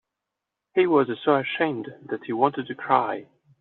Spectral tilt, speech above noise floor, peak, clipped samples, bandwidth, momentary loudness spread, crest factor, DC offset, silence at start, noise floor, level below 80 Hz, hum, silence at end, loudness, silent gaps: -4 dB/octave; 61 dB; -4 dBFS; under 0.1%; 4.2 kHz; 13 LU; 20 dB; under 0.1%; 0.75 s; -85 dBFS; -72 dBFS; none; 0.35 s; -24 LUFS; none